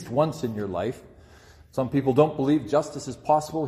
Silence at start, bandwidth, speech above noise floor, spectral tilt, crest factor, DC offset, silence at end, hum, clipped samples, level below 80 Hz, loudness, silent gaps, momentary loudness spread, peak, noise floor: 0 s; 14.5 kHz; 27 dB; -7 dB/octave; 20 dB; under 0.1%; 0 s; none; under 0.1%; -56 dBFS; -25 LUFS; none; 12 LU; -6 dBFS; -51 dBFS